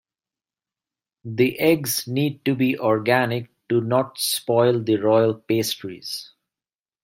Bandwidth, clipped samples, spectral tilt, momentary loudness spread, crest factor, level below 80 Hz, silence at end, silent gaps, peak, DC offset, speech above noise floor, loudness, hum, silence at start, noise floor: 16.5 kHz; under 0.1%; -5 dB/octave; 12 LU; 20 dB; -64 dBFS; 0.75 s; none; -2 dBFS; under 0.1%; over 69 dB; -21 LUFS; none; 1.25 s; under -90 dBFS